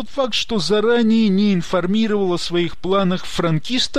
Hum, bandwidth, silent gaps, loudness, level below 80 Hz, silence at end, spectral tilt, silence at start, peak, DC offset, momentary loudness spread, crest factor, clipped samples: none; 11.5 kHz; none; -18 LUFS; -44 dBFS; 0 s; -5.5 dB/octave; 0 s; -6 dBFS; 4%; 5 LU; 12 dB; under 0.1%